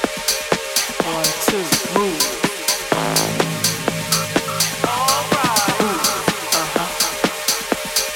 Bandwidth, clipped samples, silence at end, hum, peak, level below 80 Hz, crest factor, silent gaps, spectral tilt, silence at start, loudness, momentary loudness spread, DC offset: 19 kHz; under 0.1%; 0 s; none; -2 dBFS; -48 dBFS; 18 dB; none; -2 dB/octave; 0 s; -18 LUFS; 3 LU; under 0.1%